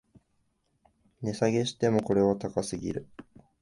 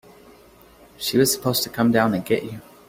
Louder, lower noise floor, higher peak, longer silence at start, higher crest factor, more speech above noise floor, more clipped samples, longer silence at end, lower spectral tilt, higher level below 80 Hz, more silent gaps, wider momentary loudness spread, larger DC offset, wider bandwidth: second, -29 LUFS vs -21 LUFS; first, -73 dBFS vs -50 dBFS; second, -10 dBFS vs -4 dBFS; first, 1.2 s vs 1 s; about the same, 20 dB vs 18 dB; first, 46 dB vs 29 dB; neither; first, 0.4 s vs 0.25 s; first, -6 dB/octave vs -4 dB/octave; about the same, -58 dBFS vs -56 dBFS; neither; first, 12 LU vs 7 LU; neither; second, 11.5 kHz vs 16.5 kHz